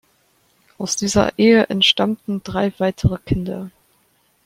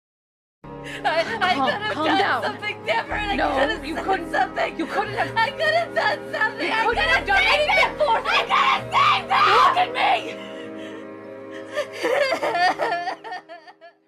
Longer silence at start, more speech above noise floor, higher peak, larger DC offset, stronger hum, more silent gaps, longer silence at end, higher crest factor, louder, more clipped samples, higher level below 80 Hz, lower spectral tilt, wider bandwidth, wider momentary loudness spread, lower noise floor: first, 0.8 s vs 0.65 s; first, 43 dB vs 26 dB; first, -2 dBFS vs -8 dBFS; neither; neither; neither; first, 0.75 s vs 0.2 s; about the same, 18 dB vs 14 dB; first, -18 LUFS vs -21 LUFS; neither; first, -42 dBFS vs -48 dBFS; about the same, -4.5 dB/octave vs -3.5 dB/octave; about the same, 15.5 kHz vs 14.5 kHz; second, 14 LU vs 18 LU; first, -61 dBFS vs -47 dBFS